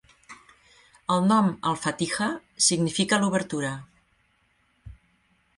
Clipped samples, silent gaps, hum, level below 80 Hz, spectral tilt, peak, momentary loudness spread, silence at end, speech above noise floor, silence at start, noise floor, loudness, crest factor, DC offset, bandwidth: under 0.1%; none; none; -60 dBFS; -3.5 dB/octave; -8 dBFS; 9 LU; 0.65 s; 43 dB; 0.3 s; -67 dBFS; -24 LUFS; 20 dB; under 0.1%; 11.5 kHz